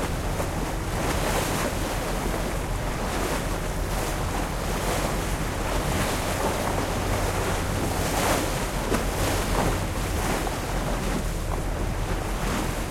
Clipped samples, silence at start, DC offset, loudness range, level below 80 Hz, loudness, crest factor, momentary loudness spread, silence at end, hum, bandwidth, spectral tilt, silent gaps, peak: under 0.1%; 0 s; under 0.1%; 2 LU; -32 dBFS; -27 LUFS; 16 dB; 4 LU; 0 s; none; 16.5 kHz; -4.5 dB/octave; none; -10 dBFS